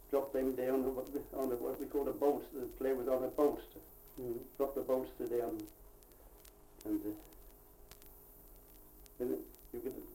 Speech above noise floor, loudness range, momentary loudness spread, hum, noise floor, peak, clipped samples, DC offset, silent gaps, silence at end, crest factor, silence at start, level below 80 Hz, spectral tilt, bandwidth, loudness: 22 dB; 11 LU; 23 LU; none; -59 dBFS; -20 dBFS; under 0.1%; under 0.1%; none; 0 s; 20 dB; 0 s; -60 dBFS; -6 dB/octave; 17 kHz; -38 LUFS